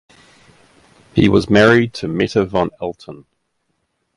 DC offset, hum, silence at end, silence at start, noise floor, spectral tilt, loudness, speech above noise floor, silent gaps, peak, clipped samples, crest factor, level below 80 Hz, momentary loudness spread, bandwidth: under 0.1%; none; 1 s; 1.15 s; -69 dBFS; -6.5 dB/octave; -15 LUFS; 54 dB; none; 0 dBFS; under 0.1%; 18 dB; -42 dBFS; 17 LU; 11.5 kHz